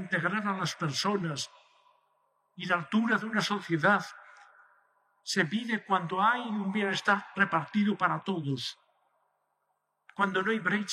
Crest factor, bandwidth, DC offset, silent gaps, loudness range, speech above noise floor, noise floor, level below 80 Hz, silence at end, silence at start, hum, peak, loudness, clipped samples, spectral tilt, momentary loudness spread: 20 dB; 13.5 kHz; under 0.1%; none; 3 LU; 49 dB; -79 dBFS; -82 dBFS; 0 s; 0 s; 50 Hz at -55 dBFS; -10 dBFS; -29 LUFS; under 0.1%; -4.5 dB/octave; 8 LU